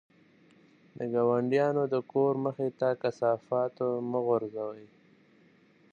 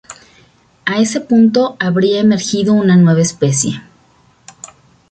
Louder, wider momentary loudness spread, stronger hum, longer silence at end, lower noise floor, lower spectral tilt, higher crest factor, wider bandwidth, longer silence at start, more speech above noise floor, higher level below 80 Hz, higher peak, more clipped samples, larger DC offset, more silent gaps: second, -30 LUFS vs -13 LUFS; about the same, 10 LU vs 12 LU; neither; second, 1.1 s vs 1.3 s; first, -62 dBFS vs -51 dBFS; first, -8.5 dB/octave vs -5.5 dB/octave; about the same, 16 dB vs 12 dB; second, 7.2 kHz vs 9.2 kHz; first, 0.95 s vs 0.1 s; second, 33 dB vs 39 dB; second, -80 dBFS vs -54 dBFS; second, -14 dBFS vs -2 dBFS; neither; neither; neither